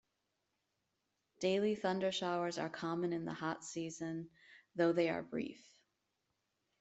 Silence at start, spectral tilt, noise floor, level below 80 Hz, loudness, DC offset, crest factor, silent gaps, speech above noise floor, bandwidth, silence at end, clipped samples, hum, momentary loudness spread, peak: 1.4 s; -5 dB/octave; -85 dBFS; -80 dBFS; -38 LUFS; under 0.1%; 20 dB; none; 48 dB; 8.2 kHz; 1.25 s; under 0.1%; none; 10 LU; -20 dBFS